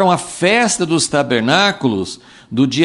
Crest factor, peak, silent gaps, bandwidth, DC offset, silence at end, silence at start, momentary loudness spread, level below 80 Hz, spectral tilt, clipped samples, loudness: 14 dB; 0 dBFS; none; 11.5 kHz; under 0.1%; 0 s; 0 s; 11 LU; -54 dBFS; -4 dB/octave; under 0.1%; -15 LUFS